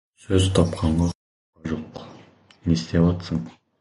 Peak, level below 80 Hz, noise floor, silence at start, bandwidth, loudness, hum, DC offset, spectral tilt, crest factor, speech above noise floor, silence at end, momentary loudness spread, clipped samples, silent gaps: -2 dBFS; -36 dBFS; -51 dBFS; 0.3 s; 11.5 kHz; -23 LUFS; none; under 0.1%; -6.5 dB/octave; 20 dB; 29 dB; 0.3 s; 20 LU; under 0.1%; 1.15-1.53 s